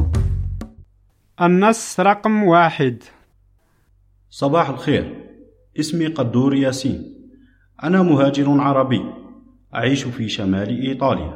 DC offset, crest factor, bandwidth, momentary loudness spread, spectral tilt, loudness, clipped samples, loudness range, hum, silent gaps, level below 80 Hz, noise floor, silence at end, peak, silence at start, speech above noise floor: under 0.1%; 18 dB; 14.5 kHz; 17 LU; -6 dB/octave; -18 LUFS; under 0.1%; 4 LU; none; none; -36 dBFS; -58 dBFS; 0 s; -2 dBFS; 0 s; 40 dB